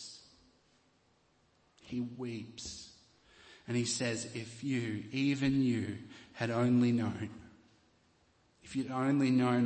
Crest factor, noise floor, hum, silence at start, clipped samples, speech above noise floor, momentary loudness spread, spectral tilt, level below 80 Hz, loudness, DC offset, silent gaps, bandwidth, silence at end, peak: 16 dB; -71 dBFS; none; 0 s; under 0.1%; 38 dB; 19 LU; -5.5 dB/octave; -68 dBFS; -34 LUFS; under 0.1%; none; 8.8 kHz; 0 s; -20 dBFS